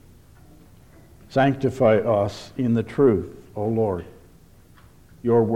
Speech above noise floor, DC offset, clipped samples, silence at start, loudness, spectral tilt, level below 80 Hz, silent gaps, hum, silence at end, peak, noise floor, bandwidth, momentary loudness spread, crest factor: 30 dB; under 0.1%; under 0.1%; 1.3 s; -22 LUFS; -8 dB/octave; -52 dBFS; none; none; 0 s; -6 dBFS; -50 dBFS; 15 kHz; 10 LU; 18 dB